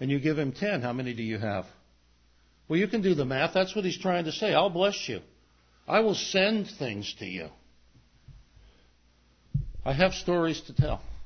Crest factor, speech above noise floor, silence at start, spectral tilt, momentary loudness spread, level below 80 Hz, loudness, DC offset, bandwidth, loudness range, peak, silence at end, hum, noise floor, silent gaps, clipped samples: 20 dB; 35 dB; 0 s; -5.5 dB/octave; 11 LU; -48 dBFS; -28 LUFS; under 0.1%; 6.6 kHz; 6 LU; -8 dBFS; 0 s; 60 Hz at -55 dBFS; -63 dBFS; none; under 0.1%